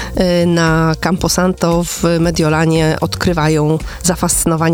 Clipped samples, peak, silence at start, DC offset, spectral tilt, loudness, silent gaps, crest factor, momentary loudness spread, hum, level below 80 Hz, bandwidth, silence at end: under 0.1%; -2 dBFS; 0 s; under 0.1%; -5 dB/octave; -14 LUFS; none; 12 dB; 3 LU; none; -30 dBFS; 19.5 kHz; 0 s